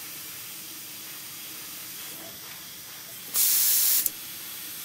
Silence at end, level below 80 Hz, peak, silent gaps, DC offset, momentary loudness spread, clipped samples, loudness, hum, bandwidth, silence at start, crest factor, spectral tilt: 0 s; -74 dBFS; -4 dBFS; none; under 0.1%; 19 LU; under 0.1%; -24 LUFS; none; 16 kHz; 0 s; 26 dB; 1.5 dB/octave